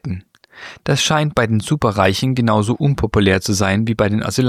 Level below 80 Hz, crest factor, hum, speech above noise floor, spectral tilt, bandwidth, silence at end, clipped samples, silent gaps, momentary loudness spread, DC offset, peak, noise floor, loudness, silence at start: -38 dBFS; 16 dB; none; 23 dB; -5 dB/octave; 15.5 kHz; 0 s; under 0.1%; none; 12 LU; under 0.1%; -2 dBFS; -39 dBFS; -16 LUFS; 0.05 s